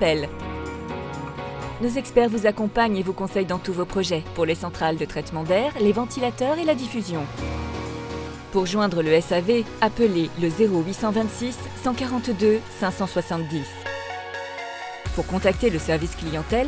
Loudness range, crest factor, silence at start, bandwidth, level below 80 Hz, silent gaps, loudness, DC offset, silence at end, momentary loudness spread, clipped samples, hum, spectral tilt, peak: 4 LU; 20 dB; 0 s; 8 kHz; -40 dBFS; none; -24 LUFS; under 0.1%; 0 s; 11 LU; under 0.1%; none; -6 dB/octave; -4 dBFS